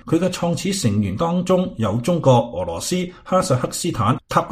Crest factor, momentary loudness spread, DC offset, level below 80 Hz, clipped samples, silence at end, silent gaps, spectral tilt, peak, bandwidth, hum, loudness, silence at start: 18 dB; 6 LU; under 0.1%; -46 dBFS; under 0.1%; 0 s; none; -6 dB/octave; -2 dBFS; 15.5 kHz; none; -20 LUFS; 0.05 s